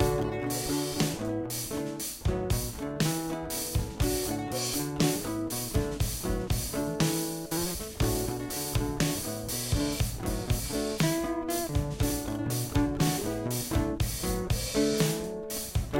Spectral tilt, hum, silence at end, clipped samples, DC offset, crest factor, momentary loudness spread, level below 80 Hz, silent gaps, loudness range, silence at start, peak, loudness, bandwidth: -4.5 dB/octave; none; 0 s; under 0.1%; under 0.1%; 18 dB; 5 LU; -40 dBFS; none; 2 LU; 0 s; -12 dBFS; -30 LUFS; 17 kHz